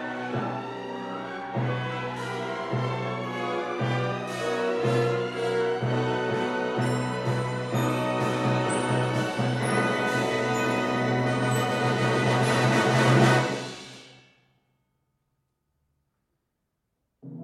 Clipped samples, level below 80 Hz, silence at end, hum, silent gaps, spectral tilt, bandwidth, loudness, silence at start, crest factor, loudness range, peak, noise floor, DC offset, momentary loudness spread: under 0.1%; -64 dBFS; 0 s; none; none; -5.5 dB/octave; 13.5 kHz; -26 LUFS; 0 s; 18 dB; 7 LU; -8 dBFS; -79 dBFS; under 0.1%; 10 LU